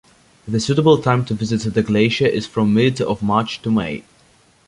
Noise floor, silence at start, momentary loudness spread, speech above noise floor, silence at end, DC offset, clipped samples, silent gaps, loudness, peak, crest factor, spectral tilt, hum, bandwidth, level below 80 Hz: -54 dBFS; 0.45 s; 7 LU; 37 dB; 0.65 s; under 0.1%; under 0.1%; none; -18 LUFS; -2 dBFS; 16 dB; -6.5 dB/octave; none; 11.5 kHz; -48 dBFS